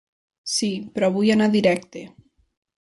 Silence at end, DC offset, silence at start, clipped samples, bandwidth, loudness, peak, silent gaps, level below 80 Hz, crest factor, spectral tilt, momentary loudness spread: 0.75 s; under 0.1%; 0.45 s; under 0.1%; 11.5 kHz; -21 LUFS; -6 dBFS; none; -62 dBFS; 16 dB; -4.5 dB/octave; 19 LU